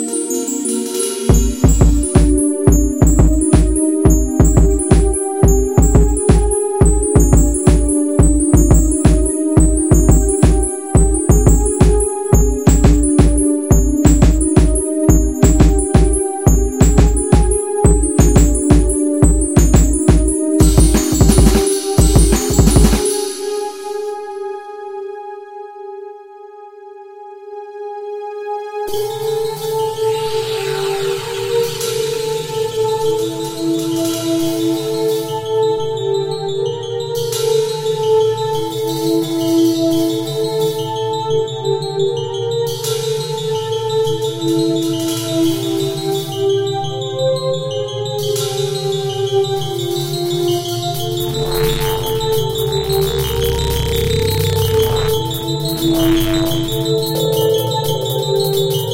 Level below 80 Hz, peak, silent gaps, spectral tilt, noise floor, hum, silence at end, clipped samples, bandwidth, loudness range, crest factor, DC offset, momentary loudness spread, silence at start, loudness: -18 dBFS; 0 dBFS; none; -5.5 dB/octave; -36 dBFS; none; 0 s; under 0.1%; 16.5 kHz; 7 LU; 14 dB; under 0.1%; 9 LU; 0 s; -15 LUFS